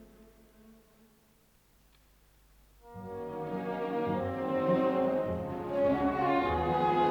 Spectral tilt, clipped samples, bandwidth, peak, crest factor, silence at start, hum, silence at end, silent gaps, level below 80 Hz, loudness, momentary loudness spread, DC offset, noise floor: -8 dB/octave; under 0.1%; over 20 kHz; -16 dBFS; 16 dB; 0 s; none; 0 s; none; -56 dBFS; -31 LUFS; 12 LU; under 0.1%; -65 dBFS